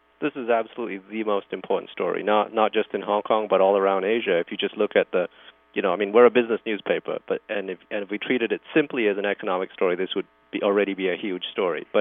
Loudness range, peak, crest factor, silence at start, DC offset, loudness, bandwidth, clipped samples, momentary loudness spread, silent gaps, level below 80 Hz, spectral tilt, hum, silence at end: 3 LU; -4 dBFS; 20 dB; 0.2 s; under 0.1%; -24 LUFS; 3.9 kHz; under 0.1%; 10 LU; none; -76 dBFS; -9 dB/octave; none; 0 s